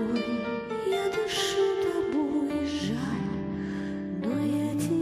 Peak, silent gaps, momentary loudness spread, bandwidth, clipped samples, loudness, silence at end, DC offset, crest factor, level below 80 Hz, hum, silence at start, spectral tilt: -16 dBFS; none; 7 LU; 14.5 kHz; under 0.1%; -29 LUFS; 0 s; under 0.1%; 12 dB; -56 dBFS; none; 0 s; -5 dB/octave